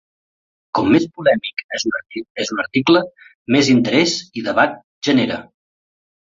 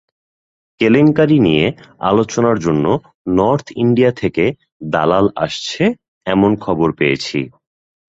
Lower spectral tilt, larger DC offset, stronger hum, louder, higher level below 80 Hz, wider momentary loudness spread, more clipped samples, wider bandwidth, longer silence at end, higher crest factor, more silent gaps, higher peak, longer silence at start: second, -4.5 dB/octave vs -6.5 dB/octave; neither; neither; about the same, -17 LUFS vs -15 LUFS; second, -56 dBFS vs -46 dBFS; about the same, 11 LU vs 9 LU; neither; about the same, 7.8 kHz vs 8 kHz; first, 0.8 s vs 0.65 s; about the same, 18 dB vs 14 dB; first, 1.64-1.69 s, 2.30-2.35 s, 3.35-3.45 s, 4.84-5.01 s vs 3.15-3.25 s, 4.72-4.80 s, 6.08-6.21 s; about the same, -2 dBFS vs 0 dBFS; about the same, 0.75 s vs 0.8 s